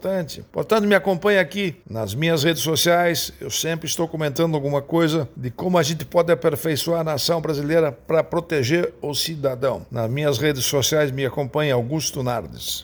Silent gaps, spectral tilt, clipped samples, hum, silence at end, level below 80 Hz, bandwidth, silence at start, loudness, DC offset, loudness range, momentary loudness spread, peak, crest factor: none; -4.5 dB/octave; under 0.1%; none; 0 s; -52 dBFS; over 20 kHz; 0 s; -21 LUFS; under 0.1%; 2 LU; 8 LU; -2 dBFS; 18 dB